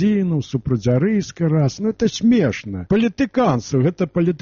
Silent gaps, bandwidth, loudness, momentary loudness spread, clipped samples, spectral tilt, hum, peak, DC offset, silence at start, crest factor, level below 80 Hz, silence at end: none; 7.2 kHz; -19 LUFS; 5 LU; under 0.1%; -7 dB/octave; none; -6 dBFS; under 0.1%; 0 s; 12 dB; -46 dBFS; 0.05 s